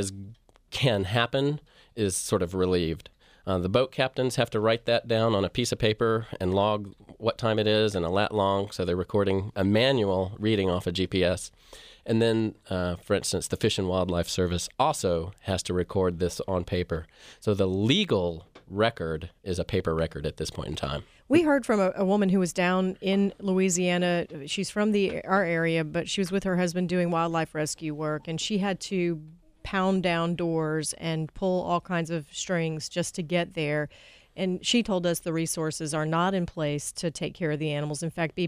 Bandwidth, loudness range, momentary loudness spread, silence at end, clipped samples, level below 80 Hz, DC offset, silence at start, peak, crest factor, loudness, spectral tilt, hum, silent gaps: 15.5 kHz; 3 LU; 9 LU; 0 s; under 0.1%; -52 dBFS; under 0.1%; 0 s; -8 dBFS; 20 dB; -27 LUFS; -5 dB/octave; none; none